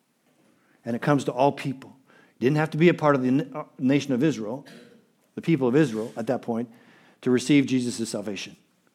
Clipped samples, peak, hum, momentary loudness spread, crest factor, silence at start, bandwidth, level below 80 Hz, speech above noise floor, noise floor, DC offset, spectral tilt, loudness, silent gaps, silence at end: under 0.1%; -6 dBFS; none; 15 LU; 20 dB; 0.85 s; 14 kHz; -78 dBFS; 41 dB; -64 dBFS; under 0.1%; -6.5 dB/octave; -24 LUFS; none; 0.45 s